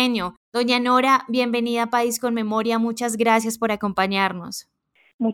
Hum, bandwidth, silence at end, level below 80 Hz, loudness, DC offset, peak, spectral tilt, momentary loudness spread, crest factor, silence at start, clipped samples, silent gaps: none; 18 kHz; 0 s; -62 dBFS; -21 LUFS; under 0.1%; -6 dBFS; -4 dB/octave; 9 LU; 16 dB; 0 s; under 0.1%; 0.37-0.52 s, 5.14-5.19 s